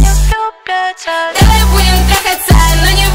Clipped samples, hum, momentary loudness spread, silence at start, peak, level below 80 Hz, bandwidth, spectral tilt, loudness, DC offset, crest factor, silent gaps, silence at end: 0.4%; none; 8 LU; 0 s; 0 dBFS; -12 dBFS; 16.5 kHz; -4 dB/octave; -10 LUFS; under 0.1%; 8 dB; none; 0 s